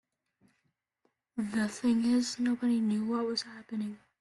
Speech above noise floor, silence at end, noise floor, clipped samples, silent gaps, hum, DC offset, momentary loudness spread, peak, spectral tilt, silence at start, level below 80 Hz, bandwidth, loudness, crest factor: 49 dB; 0.25 s; -79 dBFS; under 0.1%; none; none; under 0.1%; 10 LU; -18 dBFS; -4.5 dB/octave; 1.35 s; -72 dBFS; 11.5 kHz; -31 LUFS; 14 dB